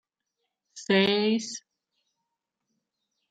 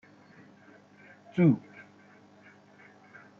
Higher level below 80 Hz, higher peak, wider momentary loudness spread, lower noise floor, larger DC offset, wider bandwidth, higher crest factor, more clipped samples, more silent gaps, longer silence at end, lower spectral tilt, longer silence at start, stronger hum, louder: about the same, -76 dBFS vs -74 dBFS; about the same, -10 dBFS vs -12 dBFS; second, 19 LU vs 28 LU; first, -84 dBFS vs -57 dBFS; neither; first, 9.2 kHz vs 6.4 kHz; about the same, 20 dB vs 22 dB; neither; neither; about the same, 1.7 s vs 1.8 s; second, -4.5 dB/octave vs -9.5 dB/octave; second, 0.75 s vs 1.35 s; second, none vs 50 Hz at -55 dBFS; first, -24 LUFS vs -27 LUFS